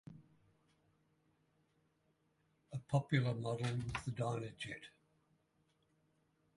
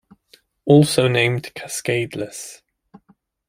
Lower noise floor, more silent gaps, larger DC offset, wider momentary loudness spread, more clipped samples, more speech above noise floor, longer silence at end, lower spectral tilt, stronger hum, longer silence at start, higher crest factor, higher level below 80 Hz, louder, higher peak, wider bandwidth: first, -79 dBFS vs -59 dBFS; neither; neither; about the same, 15 LU vs 17 LU; neither; about the same, 40 dB vs 41 dB; first, 1.7 s vs 0.95 s; about the same, -6.5 dB/octave vs -5.5 dB/octave; neither; second, 0.05 s vs 0.65 s; first, 24 dB vs 18 dB; second, -68 dBFS vs -56 dBFS; second, -40 LUFS vs -19 LUFS; second, -20 dBFS vs -2 dBFS; second, 11.5 kHz vs 16 kHz